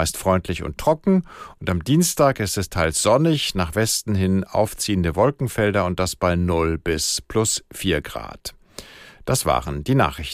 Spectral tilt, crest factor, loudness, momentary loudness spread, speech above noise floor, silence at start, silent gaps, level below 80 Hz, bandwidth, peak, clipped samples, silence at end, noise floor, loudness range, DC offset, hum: -4.5 dB/octave; 16 dB; -21 LUFS; 13 LU; 21 dB; 0 s; none; -40 dBFS; 15.5 kHz; -4 dBFS; under 0.1%; 0 s; -42 dBFS; 4 LU; under 0.1%; none